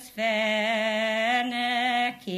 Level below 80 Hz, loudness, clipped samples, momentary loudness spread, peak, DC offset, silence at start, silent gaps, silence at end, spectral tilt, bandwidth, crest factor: -72 dBFS; -25 LUFS; under 0.1%; 2 LU; -12 dBFS; under 0.1%; 0 s; none; 0 s; -3.5 dB/octave; 15 kHz; 14 dB